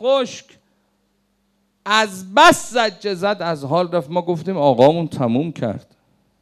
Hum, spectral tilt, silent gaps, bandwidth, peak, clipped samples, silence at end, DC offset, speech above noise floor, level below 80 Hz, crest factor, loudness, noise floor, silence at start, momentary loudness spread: none; -4.5 dB/octave; none; 15 kHz; -2 dBFS; under 0.1%; 0.6 s; under 0.1%; 48 dB; -58 dBFS; 18 dB; -17 LUFS; -65 dBFS; 0 s; 14 LU